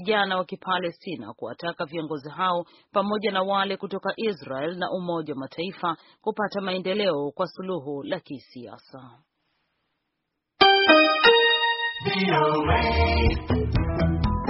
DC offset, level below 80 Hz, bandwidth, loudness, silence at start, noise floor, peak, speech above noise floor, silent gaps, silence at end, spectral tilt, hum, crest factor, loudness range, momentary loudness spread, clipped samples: under 0.1%; -36 dBFS; 6 kHz; -23 LUFS; 0 s; -80 dBFS; -2 dBFS; 55 dB; none; 0 s; -3 dB/octave; none; 24 dB; 11 LU; 16 LU; under 0.1%